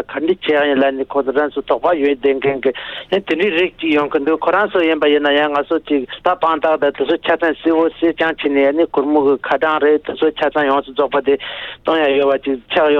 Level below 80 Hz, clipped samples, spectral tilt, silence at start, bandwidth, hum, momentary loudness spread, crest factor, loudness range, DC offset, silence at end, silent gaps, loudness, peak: -52 dBFS; under 0.1%; -6.5 dB/octave; 0 s; 5.6 kHz; none; 5 LU; 14 dB; 1 LU; under 0.1%; 0 s; none; -16 LUFS; -2 dBFS